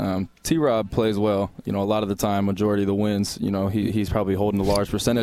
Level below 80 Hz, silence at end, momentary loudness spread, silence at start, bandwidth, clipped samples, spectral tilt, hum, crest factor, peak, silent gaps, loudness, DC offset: -42 dBFS; 0 s; 4 LU; 0 s; 15.5 kHz; under 0.1%; -6 dB/octave; none; 14 dB; -8 dBFS; none; -23 LUFS; under 0.1%